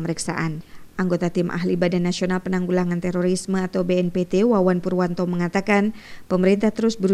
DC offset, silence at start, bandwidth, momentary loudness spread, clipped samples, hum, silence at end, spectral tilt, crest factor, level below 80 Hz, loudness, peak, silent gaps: under 0.1%; 0 s; 12 kHz; 7 LU; under 0.1%; none; 0 s; -6.5 dB/octave; 16 dB; -50 dBFS; -22 LUFS; -4 dBFS; none